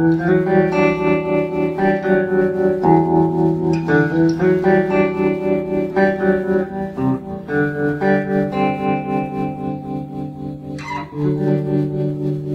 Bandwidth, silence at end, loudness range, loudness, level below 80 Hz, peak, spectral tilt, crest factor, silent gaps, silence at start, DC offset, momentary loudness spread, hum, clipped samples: 7.2 kHz; 0 s; 6 LU; -18 LUFS; -48 dBFS; -2 dBFS; -9 dB/octave; 16 dB; none; 0 s; under 0.1%; 11 LU; none; under 0.1%